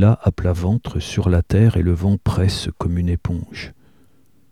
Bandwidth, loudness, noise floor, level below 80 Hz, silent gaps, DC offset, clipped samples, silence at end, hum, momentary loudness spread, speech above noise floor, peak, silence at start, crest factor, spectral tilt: 12 kHz; -19 LUFS; -57 dBFS; -32 dBFS; none; 0.3%; under 0.1%; 0.8 s; none; 11 LU; 40 dB; -2 dBFS; 0 s; 16 dB; -7.5 dB/octave